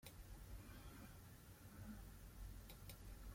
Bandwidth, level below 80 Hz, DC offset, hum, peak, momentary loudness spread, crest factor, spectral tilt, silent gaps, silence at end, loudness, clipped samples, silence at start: 16.5 kHz; -60 dBFS; under 0.1%; none; -40 dBFS; 4 LU; 18 dB; -5 dB/octave; none; 0 s; -59 LUFS; under 0.1%; 0 s